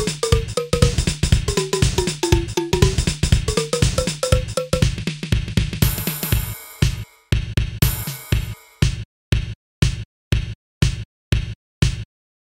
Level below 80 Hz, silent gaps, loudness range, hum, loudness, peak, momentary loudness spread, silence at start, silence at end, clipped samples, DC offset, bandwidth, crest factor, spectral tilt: -26 dBFS; 9.05-9.32 s, 9.55-9.82 s, 10.05-10.31 s, 10.55-10.81 s, 11.05-11.32 s, 11.55-11.82 s; 5 LU; none; -21 LUFS; 0 dBFS; 8 LU; 0 s; 0.4 s; under 0.1%; 0.2%; 16.5 kHz; 20 dB; -5 dB/octave